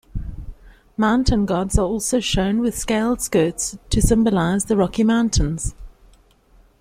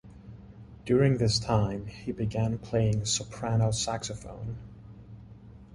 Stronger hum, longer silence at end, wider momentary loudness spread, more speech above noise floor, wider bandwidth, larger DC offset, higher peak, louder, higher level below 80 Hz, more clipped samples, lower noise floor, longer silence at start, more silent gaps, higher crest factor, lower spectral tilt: neither; first, 0.95 s vs 0 s; second, 12 LU vs 24 LU; first, 35 dB vs 21 dB; first, 16 kHz vs 11.5 kHz; neither; first, -2 dBFS vs -12 dBFS; first, -20 LUFS vs -29 LUFS; first, -30 dBFS vs -48 dBFS; neither; first, -53 dBFS vs -49 dBFS; about the same, 0.15 s vs 0.05 s; neither; about the same, 18 dB vs 18 dB; about the same, -5 dB/octave vs -5 dB/octave